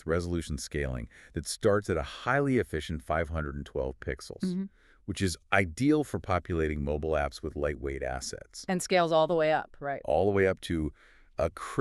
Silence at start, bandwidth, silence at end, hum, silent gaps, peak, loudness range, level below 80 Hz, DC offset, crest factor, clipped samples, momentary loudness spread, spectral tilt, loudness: 0.05 s; 13.5 kHz; 0 s; none; none; -8 dBFS; 3 LU; -44 dBFS; under 0.1%; 22 dB; under 0.1%; 12 LU; -5.5 dB/octave; -30 LUFS